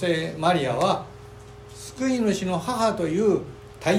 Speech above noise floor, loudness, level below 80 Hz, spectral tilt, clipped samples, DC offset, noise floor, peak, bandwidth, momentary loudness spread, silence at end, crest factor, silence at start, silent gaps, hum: 20 dB; -24 LUFS; -52 dBFS; -5.5 dB/octave; under 0.1%; under 0.1%; -43 dBFS; -8 dBFS; 16 kHz; 20 LU; 0 s; 18 dB; 0 s; none; none